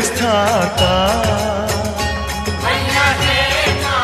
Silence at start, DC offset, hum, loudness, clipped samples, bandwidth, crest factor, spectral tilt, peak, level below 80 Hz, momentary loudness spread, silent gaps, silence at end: 0 s; 0.1%; none; -15 LUFS; under 0.1%; 15 kHz; 16 dB; -3.5 dB/octave; 0 dBFS; -28 dBFS; 6 LU; none; 0 s